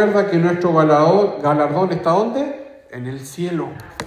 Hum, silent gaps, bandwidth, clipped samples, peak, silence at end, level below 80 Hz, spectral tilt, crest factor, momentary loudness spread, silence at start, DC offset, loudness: none; none; 15.5 kHz; under 0.1%; -2 dBFS; 0 s; -56 dBFS; -7 dB/octave; 16 dB; 16 LU; 0 s; under 0.1%; -17 LUFS